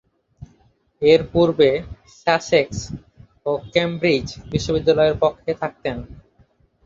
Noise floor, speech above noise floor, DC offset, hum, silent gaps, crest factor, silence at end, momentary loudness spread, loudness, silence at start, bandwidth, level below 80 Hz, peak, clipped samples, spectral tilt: -59 dBFS; 40 dB; under 0.1%; none; none; 20 dB; 0.7 s; 14 LU; -20 LUFS; 0.4 s; 7.8 kHz; -44 dBFS; 0 dBFS; under 0.1%; -5.5 dB/octave